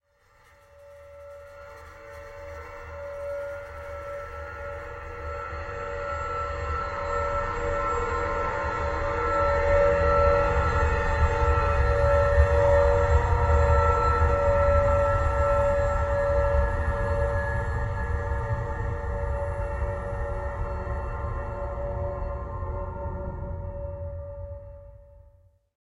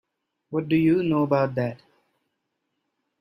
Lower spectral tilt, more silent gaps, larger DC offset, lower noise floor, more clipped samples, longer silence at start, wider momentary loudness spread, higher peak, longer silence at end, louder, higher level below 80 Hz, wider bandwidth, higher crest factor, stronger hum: second, -7 dB/octave vs -9.5 dB/octave; neither; neither; second, -60 dBFS vs -78 dBFS; neither; first, 0.8 s vs 0.5 s; first, 17 LU vs 10 LU; about the same, -6 dBFS vs -8 dBFS; second, 0.7 s vs 1.45 s; second, -26 LUFS vs -23 LUFS; first, -30 dBFS vs -62 dBFS; first, 8 kHz vs 5.8 kHz; about the same, 20 dB vs 18 dB; neither